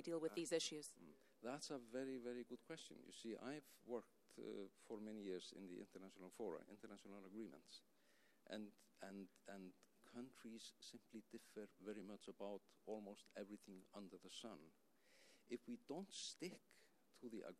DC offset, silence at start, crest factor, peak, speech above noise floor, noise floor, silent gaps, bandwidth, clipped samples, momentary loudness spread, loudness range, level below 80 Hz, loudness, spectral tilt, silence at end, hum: under 0.1%; 0 s; 24 dB; -30 dBFS; 24 dB; -79 dBFS; none; 13.5 kHz; under 0.1%; 11 LU; 6 LU; under -90 dBFS; -55 LUFS; -3.5 dB/octave; 0.05 s; none